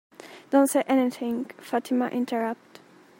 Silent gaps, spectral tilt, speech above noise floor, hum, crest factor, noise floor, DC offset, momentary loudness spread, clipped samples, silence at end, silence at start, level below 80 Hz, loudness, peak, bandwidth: none; -4 dB/octave; 27 dB; none; 18 dB; -52 dBFS; under 0.1%; 15 LU; under 0.1%; 0.65 s; 0.25 s; -78 dBFS; -26 LUFS; -8 dBFS; 16.5 kHz